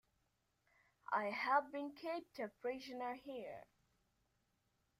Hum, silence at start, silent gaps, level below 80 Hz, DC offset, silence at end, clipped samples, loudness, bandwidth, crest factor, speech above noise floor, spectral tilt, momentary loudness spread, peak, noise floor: none; 1.1 s; none; -84 dBFS; under 0.1%; 1.35 s; under 0.1%; -43 LUFS; 15.5 kHz; 24 dB; 40 dB; -4.5 dB/octave; 14 LU; -22 dBFS; -83 dBFS